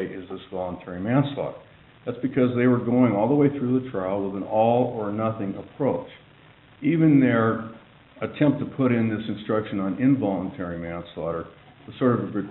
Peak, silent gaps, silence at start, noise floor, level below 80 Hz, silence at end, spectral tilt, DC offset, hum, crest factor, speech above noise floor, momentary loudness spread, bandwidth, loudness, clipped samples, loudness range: -6 dBFS; none; 0 s; -52 dBFS; -58 dBFS; 0 s; -7.5 dB/octave; under 0.1%; none; 18 dB; 29 dB; 14 LU; 4.1 kHz; -24 LUFS; under 0.1%; 4 LU